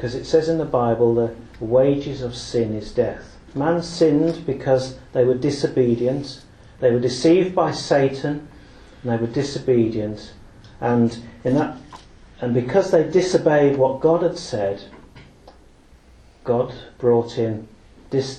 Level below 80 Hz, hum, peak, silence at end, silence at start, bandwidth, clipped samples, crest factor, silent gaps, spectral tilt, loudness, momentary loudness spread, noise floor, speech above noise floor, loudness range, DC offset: -48 dBFS; none; -4 dBFS; 0 s; 0 s; 9.6 kHz; under 0.1%; 18 dB; none; -6.5 dB/octave; -20 LUFS; 11 LU; -49 dBFS; 30 dB; 4 LU; under 0.1%